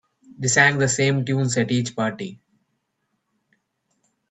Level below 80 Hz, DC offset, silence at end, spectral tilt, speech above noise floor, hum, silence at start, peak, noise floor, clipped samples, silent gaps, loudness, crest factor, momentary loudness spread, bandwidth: -62 dBFS; under 0.1%; 1.95 s; -4 dB/octave; 54 dB; none; 0.4 s; -2 dBFS; -74 dBFS; under 0.1%; none; -20 LUFS; 22 dB; 11 LU; 9.2 kHz